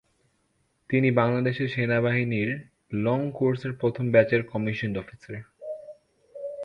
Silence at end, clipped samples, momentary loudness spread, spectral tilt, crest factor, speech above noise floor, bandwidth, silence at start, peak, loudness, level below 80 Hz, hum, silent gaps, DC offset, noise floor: 0 s; under 0.1%; 17 LU; -9 dB/octave; 20 dB; 46 dB; 6.2 kHz; 0.9 s; -6 dBFS; -25 LUFS; -60 dBFS; none; none; under 0.1%; -71 dBFS